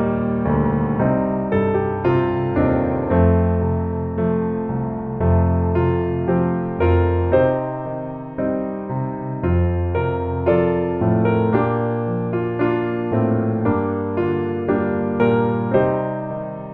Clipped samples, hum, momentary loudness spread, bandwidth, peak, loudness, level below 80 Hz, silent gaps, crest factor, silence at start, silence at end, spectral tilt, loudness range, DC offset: under 0.1%; none; 7 LU; 4.1 kHz; -4 dBFS; -20 LUFS; -36 dBFS; none; 16 dB; 0 s; 0 s; -12 dB/octave; 2 LU; under 0.1%